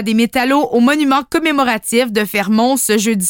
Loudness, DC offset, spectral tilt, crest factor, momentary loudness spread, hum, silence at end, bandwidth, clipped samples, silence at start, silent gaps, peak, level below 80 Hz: -14 LUFS; under 0.1%; -3.5 dB/octave; 12 dB; 3 LU; none; 0 s; 17 kHz; under 0.1%; 0 s; none; -2 dBFS; -50 dBFS